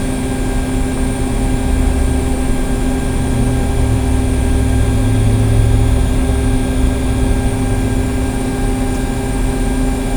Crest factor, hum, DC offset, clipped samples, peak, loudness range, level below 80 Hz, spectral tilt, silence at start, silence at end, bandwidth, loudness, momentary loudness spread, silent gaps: 12 dB; none; under 0.1%; under 0.1%; 0 dBFS; 3 LU; -16 dBFS; -6.5 dB/octave; 0 s; 0 s; over 20 kHz; -16 LUFS; 5 LU; none